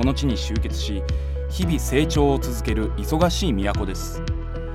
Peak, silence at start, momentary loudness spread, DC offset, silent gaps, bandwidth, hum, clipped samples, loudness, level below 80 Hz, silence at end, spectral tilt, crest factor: -6 dBFS; 0 s; 8 LU; under 0.1%; none; 15.5 kHz; none; under 0.1%; -23 LUFS; -26 dBFS; 0 s; -5.5 dB/octave; 16 dB